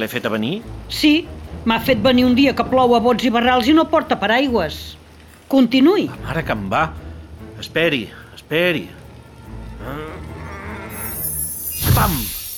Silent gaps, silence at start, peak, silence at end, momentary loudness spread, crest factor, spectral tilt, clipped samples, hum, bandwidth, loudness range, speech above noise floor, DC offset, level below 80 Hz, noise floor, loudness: none; 0 s; -4 dBFS; 0 s; 19 LU; 14 dB; -5 dB/octave; under 0.1%; none; over 20 kHz; 9 LU; 27 dB; under 0.1%; -38 dBFS; -43 dBFS; -17 LUFS